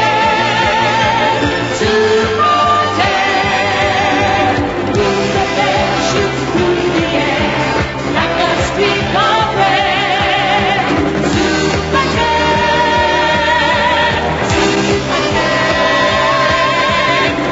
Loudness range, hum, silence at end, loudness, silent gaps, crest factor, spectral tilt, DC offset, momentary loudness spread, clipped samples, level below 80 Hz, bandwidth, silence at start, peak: 2 LU; none; 0 s; -12 LUFS; none; 12 dB; -4.5 dB/octave; under 0.1%; 3 LU; under 0.1%; -32 dBFS; 8 kHz; 0 s; 0 dBFS